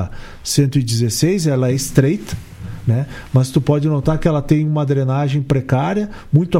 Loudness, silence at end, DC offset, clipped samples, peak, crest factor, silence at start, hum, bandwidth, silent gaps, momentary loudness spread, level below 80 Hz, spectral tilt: -17 LUFS; 0 s; under 0.1%; under 0.1%; 0 dBFS; 16 dB; 0 s; none; 16 kHz; none; 8 LU; -36 dBFS; -6.5 dB/octave